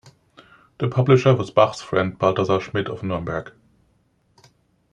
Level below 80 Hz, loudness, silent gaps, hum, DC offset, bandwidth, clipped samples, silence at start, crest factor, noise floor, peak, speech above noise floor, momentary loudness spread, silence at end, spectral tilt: -56 dBFS; -21 LUFS; none; none; under 0.1%; 9.2 kHz; under 0.1%; 0.05 s; 20 dB; -63 dBFS; -2 dBFS; 44 dB; 11 LU; 1.45 s; -7 dB/octave